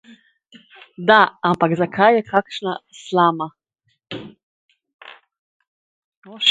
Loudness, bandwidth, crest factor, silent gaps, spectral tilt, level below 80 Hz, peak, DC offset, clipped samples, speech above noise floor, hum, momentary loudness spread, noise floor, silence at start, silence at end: -17 LUFS; 9.6 kHz; 20 dB; 4.43-4.69 s, 4.94-4.99 s, 5.39-5.60 s, 5.67-6.22 s; -5 dB/octave; -66 dBFS; 0 dBFS; under 0.1%; under 0.1%; 33 dB; none; 20 LU; -51 dBFS; 1 s; 0 s